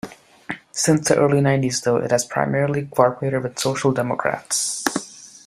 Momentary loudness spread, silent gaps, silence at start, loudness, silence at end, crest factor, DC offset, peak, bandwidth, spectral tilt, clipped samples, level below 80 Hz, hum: 12 LU; none; 0.05 s; -20 LUFS; 0.1 s; 18 dB; under 0.1%; -2 dBFS; 15.5 kHz; -4.5 dB/octave; under 0.1%; -58 dBFS; none